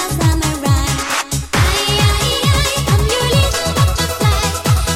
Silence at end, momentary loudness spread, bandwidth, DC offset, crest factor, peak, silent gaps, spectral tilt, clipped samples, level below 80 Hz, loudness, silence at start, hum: 0 s; 3 LU; 17 kHz; under 0.1%; 14 dB; -2 dBFS; none; -4 dB/octave; under 0.1%; -22 dBFS; -15 LUFS; 0 s; none